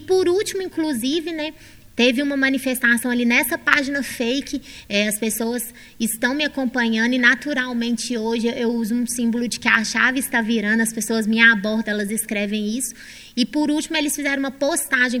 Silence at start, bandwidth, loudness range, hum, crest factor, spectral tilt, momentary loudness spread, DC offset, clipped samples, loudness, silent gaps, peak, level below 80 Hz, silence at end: 0 s; 17 kHz; 3 LU; none; 20 dB; -3 dB/octave; 9 LU; under 0.1%; under 0.1%; -20 LUFS; none; 0 dBFS; -54 dBFS; 0 s